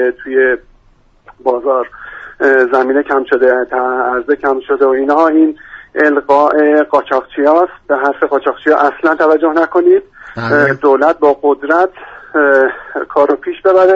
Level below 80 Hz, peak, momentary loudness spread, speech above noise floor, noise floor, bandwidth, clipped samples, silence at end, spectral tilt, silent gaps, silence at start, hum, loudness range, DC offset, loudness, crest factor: -50 dBFS; 0 dBFS; 7 LU; 37 dB; -49 dBFS; 7.2 kHz; under 0.1%; 0 s; -7 dB/octave; none; 0 s; none; 2 LU; under 0.1%; -12 LUFS; 12 dB